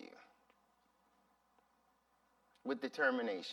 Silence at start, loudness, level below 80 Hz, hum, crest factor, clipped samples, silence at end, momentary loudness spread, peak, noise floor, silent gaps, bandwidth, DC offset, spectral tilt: 0 s; -38 LUFS; under -90 dBFS; none; 24 dB; under 0.1%; 0 s; 16 LU; -20 dBFS; -76 dBFS; none; 12.5 kHz; under 0.1%; -4 dB/octave